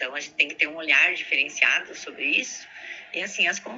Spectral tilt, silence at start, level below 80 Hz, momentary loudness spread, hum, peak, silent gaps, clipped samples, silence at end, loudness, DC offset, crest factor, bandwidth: 0 dB/octave; 0 s; -76 dBFS; 18 LU; none; -4 dBFS; none; under 0.1%; 0 s; -22 LUFS; under 0.1%; 22 dB; 8 kHz